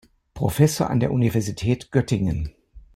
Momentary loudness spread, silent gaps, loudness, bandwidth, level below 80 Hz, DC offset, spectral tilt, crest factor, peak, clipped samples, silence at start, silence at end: 8 LU; none; -22 LUFS; 16.5 kHz; -42 dBFS; under 0.1%; -6.5 dB/octave; 18 dB; -6 dBFS; under 0.1%; 0.35 s; 0.15 s